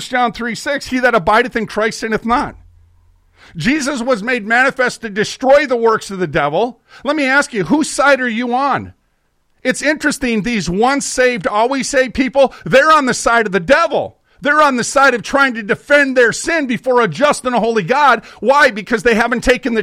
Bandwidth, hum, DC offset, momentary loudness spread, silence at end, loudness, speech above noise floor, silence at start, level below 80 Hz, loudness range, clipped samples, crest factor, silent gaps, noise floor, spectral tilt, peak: 15 kHz; none; under 0.1%; 8 LU; 0 s; -14 LUFS; 47 dB; 0 s; -42 dBFS; 4 LU; under 0.1%; 14 dB; none; -61 dBFS; -4 dB/octave; -2 dBFS